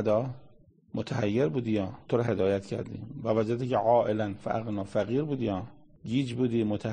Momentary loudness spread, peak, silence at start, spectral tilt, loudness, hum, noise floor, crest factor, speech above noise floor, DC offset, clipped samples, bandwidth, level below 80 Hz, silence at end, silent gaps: 12 LU; -12 dBFS; 0 s; -8 dB/octave; -29 LUFS; none; -50 dBFS; 16 dB; 22 dB; 0.1%; under 0.1%; 9.6 kHz; -60 dBFS; 0 s; none